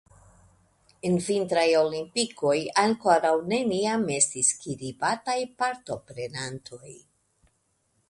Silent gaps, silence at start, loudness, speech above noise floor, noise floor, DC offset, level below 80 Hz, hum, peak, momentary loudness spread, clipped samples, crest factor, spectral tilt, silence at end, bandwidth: none; 1.05 s; -25 LUFS; 46 dB; -71 dBFS; under 0.1%; -66 dBFS; none; -6 dBFS; 14 LU; under 0.1%; 22 dB; -3.5 dB/octave; 1.1 s; 11.5 kHz